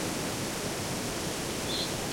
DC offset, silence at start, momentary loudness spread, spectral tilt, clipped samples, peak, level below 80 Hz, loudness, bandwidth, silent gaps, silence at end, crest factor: under 0.1%; 0 s; 2 LU; -3 dB/octave; under 0.1%; -18 dBFS; -52 dBFS; -32 LUFS; 16.5 kHz; none; 0 s; 16 dB